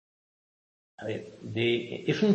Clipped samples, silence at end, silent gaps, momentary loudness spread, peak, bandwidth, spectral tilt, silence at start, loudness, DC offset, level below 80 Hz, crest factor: under 0.1%; 0 s; none; 11 LU; -12 dBFS; 8.4 kHz; -6.5 dB/octave; 1 s; -31 LUFS; under 0.1%; -70 dBFS; 18 dB